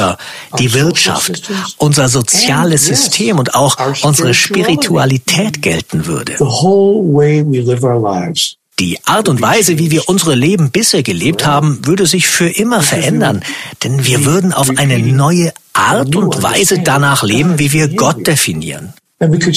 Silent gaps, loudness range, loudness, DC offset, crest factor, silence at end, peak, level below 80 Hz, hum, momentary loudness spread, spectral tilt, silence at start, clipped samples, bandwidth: none; 2 LU; -11 LUFS; under 0.1%; 12 dB; 0 s; 0 dBFS; -46 dBFS; none; 7 LU; -4 dB/octave; 0 s; under 0.1%; 15.5 kHz